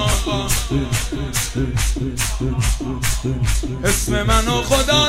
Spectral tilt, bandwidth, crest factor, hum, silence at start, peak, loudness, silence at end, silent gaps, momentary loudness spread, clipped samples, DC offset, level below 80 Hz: -4 dB/octave; 16.5 kHz; 18 dB; none; 0 s; -2 dBFS; -20 LUFS; 0 s; none; 5 LU; under 0.1%; under 0.1%; -24 dBFS